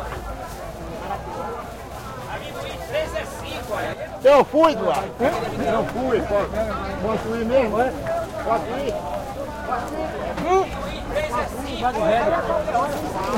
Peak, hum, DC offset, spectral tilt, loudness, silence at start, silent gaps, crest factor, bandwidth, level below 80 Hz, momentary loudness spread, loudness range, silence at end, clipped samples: -6 dBFS; none; under 0.1%; -5.5 dB/octave; -23 LUFS; 0 s; none; 18 dB; 16.5 kHz; -40 dBFS; 13 LU; 9 LU; 0 s; under 0.1%